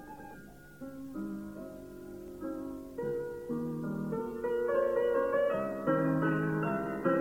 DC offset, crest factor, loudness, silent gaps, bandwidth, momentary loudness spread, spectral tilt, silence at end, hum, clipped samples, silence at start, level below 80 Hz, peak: under 0.1%; 16 dB; -33 LUFS; none; 17 kHz; 17 LU; -8.5 dB/octave; 0 s; none; under 0.1%; 0 s; -60 dBFS; -18 dBFS